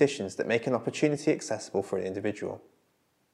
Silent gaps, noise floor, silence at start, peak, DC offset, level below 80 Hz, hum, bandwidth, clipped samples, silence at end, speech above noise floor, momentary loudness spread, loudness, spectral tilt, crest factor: none; -71 dBFS; 0 s; -10 dBFS; under 0.1%; -78 dBFS; none; 12 kHz; under 0.1%; 0.75 s; 42 dB; 9 LU; -30 LUFS; -5 dB/octave; 20 dB